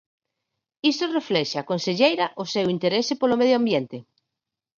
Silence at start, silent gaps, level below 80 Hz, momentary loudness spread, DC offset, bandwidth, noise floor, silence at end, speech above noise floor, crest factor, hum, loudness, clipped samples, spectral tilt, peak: 0.85 s; none; -68 dBFS; 6 LU; under 0.1%; 7.4 kHz; -85 dBFS; 0.75 s; 63 dB; 20 dB; none; -23 LUFS; under 0.1%; -5 dB/octave; -4 dBFS